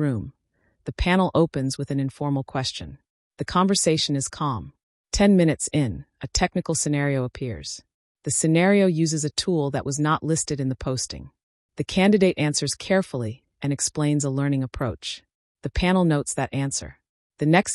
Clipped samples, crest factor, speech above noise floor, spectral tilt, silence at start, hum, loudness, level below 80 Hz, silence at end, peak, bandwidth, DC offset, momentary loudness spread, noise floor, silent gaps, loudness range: under 0.1%; 16 dB; 46 dB; -5 dB/octave; 0 s; none; -23 LUFS; -42 dBFS; 0 s; -6 dBFS; 12 kHz; under 0.1%; 15 LU; -68 dBFS; 3.10-3.31 s, 4.83-5.04 s, 7.94-8.15 s, 11.43-11.69 s, 15.35-15.55 s, 17.09-17.30 s; 3 LU